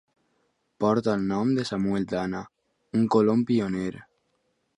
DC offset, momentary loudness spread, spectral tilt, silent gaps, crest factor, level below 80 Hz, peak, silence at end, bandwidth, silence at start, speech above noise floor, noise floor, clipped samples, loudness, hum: under 0.1%; 10 LU; -7.5 dB/octave; none; 18 dB; -60 dBFS; -8 dBFS; 0.75 s; 10.5 kHz; 0.8 s; 49 dB; -73 dBFS; under 0.1%; -25 LUFS; none